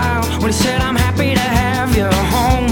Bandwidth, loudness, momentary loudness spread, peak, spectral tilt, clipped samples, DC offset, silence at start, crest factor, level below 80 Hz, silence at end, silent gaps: 19 kHz; -15 LUFS; 2 LU; -2 dBFS; -5 dB/octave; under 0.1%; under 0.1%; 0 s; 14 dB; -22 dBFS; 0 s; none